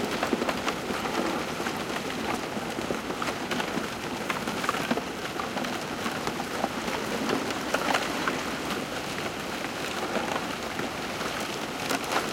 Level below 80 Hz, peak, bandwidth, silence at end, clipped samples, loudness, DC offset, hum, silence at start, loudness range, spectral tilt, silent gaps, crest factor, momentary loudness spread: -56 dBFS; -10 dBFS; 17 kHz; 0 s; under 0.1%; -30 LUFS; under 0.1%; none; 0 s; 2 LU; -3.5 dB/octave; none; 20 dB; 4 LU